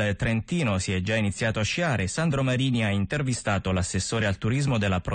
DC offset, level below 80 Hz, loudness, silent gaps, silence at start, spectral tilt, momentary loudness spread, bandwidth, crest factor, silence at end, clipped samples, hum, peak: under 0.1%; -46 dBFS; -26 LUFS; none; 0 s; -5 dB/octave; 2 LU; 9.4 kHz; 10 dB; 0 s; under 0.1%; none; -14 dBFS